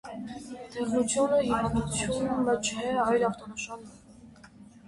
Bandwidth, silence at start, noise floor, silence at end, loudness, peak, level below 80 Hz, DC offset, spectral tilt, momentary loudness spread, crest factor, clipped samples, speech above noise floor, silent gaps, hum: 11.5 kHz; 0.05 s; -52 dBFS; 0 s; -28 LUFS; -14 dBFS; -52 dBFS; under 0.1%; -4.5 dB/octave; 15 LU; 16 dB; under 0.1%; 24 dB; none; none